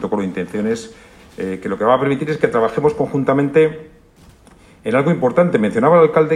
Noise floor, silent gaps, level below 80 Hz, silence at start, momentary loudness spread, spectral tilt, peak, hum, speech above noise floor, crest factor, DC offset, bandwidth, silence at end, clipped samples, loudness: -47 dBFS; none; -52 dBFS; 0 s; 13 LU; -7.5 dB/octave; 0 dBFS; none; 31 dB; 16 dB; under 0.1%; 10.5 kHz; 0 s; under 0.1%; -16 LUFS